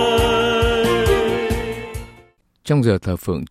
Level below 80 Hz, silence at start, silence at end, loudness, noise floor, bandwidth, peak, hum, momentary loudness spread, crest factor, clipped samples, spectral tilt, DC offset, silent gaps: -32 dBFS; 0 s; 0.05 s; -18 LUFS; -52 dBFS; 15 kHz; -4 dBFS; none; 14 LU; 14 dB; under 0.1%; -5.5 dB/octave; under 0.1%; none